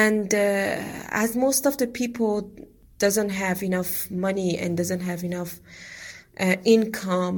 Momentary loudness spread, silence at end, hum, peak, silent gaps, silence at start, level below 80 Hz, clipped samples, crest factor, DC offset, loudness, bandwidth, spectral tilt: 16 LU; 0 s; none; -6 dBFS; none; 0 s; -56 dBFS; under 0.1%; 18 dB; under 0.1%; -24 LUFS; 17.5 kHz; -4.5 dB/octave